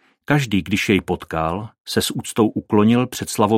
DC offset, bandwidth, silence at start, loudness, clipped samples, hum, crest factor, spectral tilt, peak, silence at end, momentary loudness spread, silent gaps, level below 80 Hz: under 0.1%; 16.5 kHz; 0.3 s; -20 LUFS; under 0.1%; none; 18 dB; -5 dB/octave; -2 dBFS; 0 s; 7 LU; 1.80-1.85 s; -46 dBFS